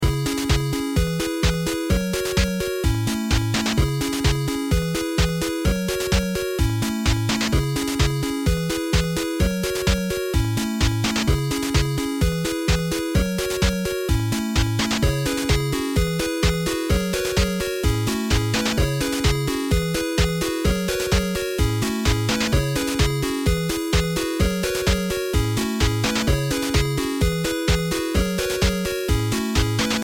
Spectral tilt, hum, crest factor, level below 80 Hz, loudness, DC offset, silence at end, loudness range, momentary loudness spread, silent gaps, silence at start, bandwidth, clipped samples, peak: -5 dB/octave; none; 16 dB; -28 dBFS; -22 LUFS; under 0.1%; 0 s; 1 LU; 2 LU; none; 0 s; 17 kHz; under 0.1%; -6 dBFS